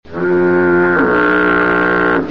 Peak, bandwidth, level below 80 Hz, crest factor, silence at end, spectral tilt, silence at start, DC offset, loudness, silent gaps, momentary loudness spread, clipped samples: -2 dBFS; 5.6 kHz; -42 dBFS; 10 dB; 0 s; -8.5 dB/octave; 0.1 s; 1%; -12 LUFS; none; 2 LU; under 0.1%